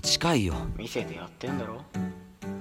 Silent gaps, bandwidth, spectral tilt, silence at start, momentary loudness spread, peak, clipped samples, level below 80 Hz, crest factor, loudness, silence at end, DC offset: none; 16.5 kHz; -4 dB/octave; 0 s; 14 LU; -10 dBFS; under 0.1%; -44 dBFS; 20 dB; -30 LUFS; 0 s; under 0.1%